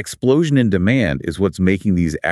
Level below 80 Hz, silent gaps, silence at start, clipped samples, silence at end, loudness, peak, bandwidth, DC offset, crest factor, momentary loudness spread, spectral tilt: -40 dBFS; none; 0 s; under 0.1%; 0 s; -17 LUFS; -2 dBFS; 12.5 kHz; under 0.1%; 16 dB; 5 LU; -7 dB/octave